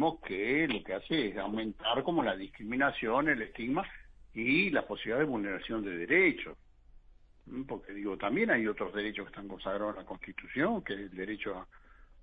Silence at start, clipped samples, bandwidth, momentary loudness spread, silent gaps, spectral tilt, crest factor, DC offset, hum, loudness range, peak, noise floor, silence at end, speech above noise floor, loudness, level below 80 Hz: 0 s; under 0.1%; 4.9 kHz; 14 LU; none; -8 dB/octave; 20 dB; under 0.1%; none; 4 LU; -14 dBFS; -58 dBFS; 0 s; 25 dB; -32 LUFS; -58 dBFS